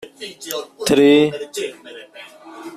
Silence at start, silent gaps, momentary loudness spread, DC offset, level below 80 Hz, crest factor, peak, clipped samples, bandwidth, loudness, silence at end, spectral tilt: 0 s; none; 26 LU; under 0.1%; -56 dBFS; 16 dB; -2 dBFS; under 0.1%; 15 kHz; -17 LUFS; 0 s; -4.5 dB/octave